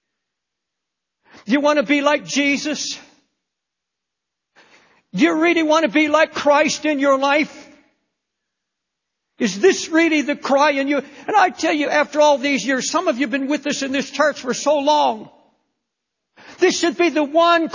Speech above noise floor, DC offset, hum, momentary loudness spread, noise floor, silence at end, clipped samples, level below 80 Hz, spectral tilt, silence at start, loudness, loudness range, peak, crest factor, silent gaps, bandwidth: 64 dB; under 0.1%; none; 7 LU; -81 dBFS; 0 s; under 0.1%; -66 dBFS; -3 dB/octave; 1.45 s; -17 LUFS; 4 LU; -2 dBFS; 18 dB; none; 7.4 kHz